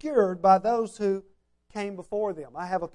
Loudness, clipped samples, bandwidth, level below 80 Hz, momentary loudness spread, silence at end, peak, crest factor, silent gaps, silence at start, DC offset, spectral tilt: -26 LUFS; under 0.1%; 11 kHz; -62 dBFS; 14 LU; 0.05 s; -8 dBFS; 18 dB; none; 0.05 s; under 0.1%; -6.5 dB/octave